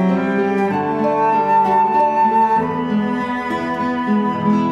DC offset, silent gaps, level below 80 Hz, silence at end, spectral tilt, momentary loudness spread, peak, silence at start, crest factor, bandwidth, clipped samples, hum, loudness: under 0.1%; none; -56 dBFS; 0 s; -8 dB/octave; 6 LU; -6 dBFS; 0 s; 10 dB; 8.2 kHz; under 0.1%; none; -17 LUFS